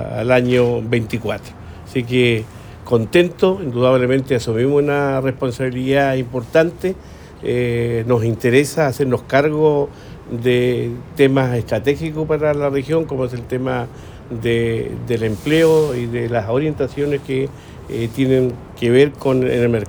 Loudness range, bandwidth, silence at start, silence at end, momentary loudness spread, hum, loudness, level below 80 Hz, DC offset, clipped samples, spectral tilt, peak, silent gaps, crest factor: 2 LU; over 20 kHz; 0 s; 0 s; 10 LU; none; -18 LUFS; -44 dBFS; under 0.1%; under 0.1%; -7 dB/octave; -2 dBFS; none; 16 dB